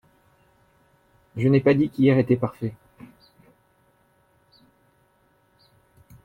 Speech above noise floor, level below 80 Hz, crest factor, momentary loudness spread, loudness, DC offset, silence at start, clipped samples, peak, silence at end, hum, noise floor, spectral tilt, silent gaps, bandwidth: 44 dB; -62 dBFS; 20 dB; 15 LU; -21 LUFS; under 0.1%; 1.35 s; under 0.1%; -8 dBFS; 3.5 s; none; -63 dBFS; -9.5 dB/octave; none; 5 kHz